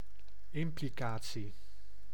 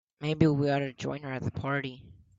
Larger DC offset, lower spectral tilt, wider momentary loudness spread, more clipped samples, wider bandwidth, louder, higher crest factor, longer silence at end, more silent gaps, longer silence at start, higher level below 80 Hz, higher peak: first, 2% vs under 0.1%; second, -5.5 dB/octave vs -7.5 dB/octave; first, 22 LU vs 10 LU; neither; first, 19 kHz vs 7.8 kHz; second, -41 LUFS vs -30 LUFS; about the same, 18 dB vs 22 dB; second, 0 s vs 0.25 s; neither; second, 0 s vs 0.2 s; about the same, -58 dBFS vs -58 dBFS; second, -24 dBFS vs -8 dBFS